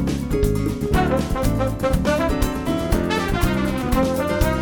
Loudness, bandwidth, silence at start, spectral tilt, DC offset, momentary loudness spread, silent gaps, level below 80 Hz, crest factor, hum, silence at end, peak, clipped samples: -21 LUFS; over 20 kHz; 0 s; -6 dB/octave; under 0.1%; 3 LU; none; -26 dBFS; 16 dB; none; 0 s; -4 dBFS; under 0.1%